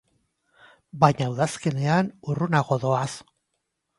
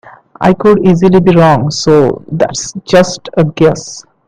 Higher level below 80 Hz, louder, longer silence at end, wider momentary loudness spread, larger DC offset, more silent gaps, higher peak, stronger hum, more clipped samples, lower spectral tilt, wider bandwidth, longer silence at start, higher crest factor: second, -62 dBFS vs -40 dBFS; second, -24 LUFS vs -10 LUFS; first, 0.8 s vs 0.25 s; about the same, 10 LU vs 8 LU; neither; neither; about the same, -2 dBFS vs 0 dBFS; neither; second, under 0.1% vs 0.5%; about the same, -6.5 dB/octave vs -6 dB/octave; first, 11.5 kHz vs 10 kHz; first, 0.95 s vs 0.05 s; first, 24 dB vs 10 dB